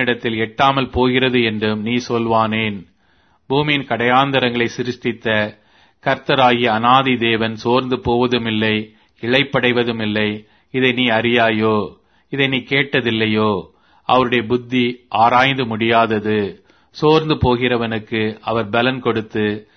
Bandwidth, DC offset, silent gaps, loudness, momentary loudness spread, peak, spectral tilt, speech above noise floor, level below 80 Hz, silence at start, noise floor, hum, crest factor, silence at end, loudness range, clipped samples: 6.6 kHz; under 0.1%; none; -17 LUFS; 8 LU; 0 dBFS; -6.5 dB/octave; 41 dB; -46 dBFS; 0 s; -58 dBFS; none; 18 dB; 0.15 s; 2 LU; under 0.1%